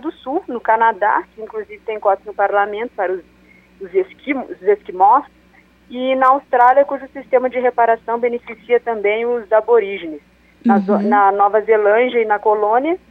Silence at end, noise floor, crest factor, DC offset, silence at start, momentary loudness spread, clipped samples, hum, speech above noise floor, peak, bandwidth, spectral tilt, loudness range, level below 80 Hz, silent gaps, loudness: 0.15 s; -50 dBFS; 14 dB; under 0.1%; 0.05 s; 14 LU; under 0.1%; 60 Hz at -55 dBFS; 34 dB; -2 dBFS; 4.9 kHz; -7.5 dB/octave; 5 LU; -58 dBFS; none; -16 LUFS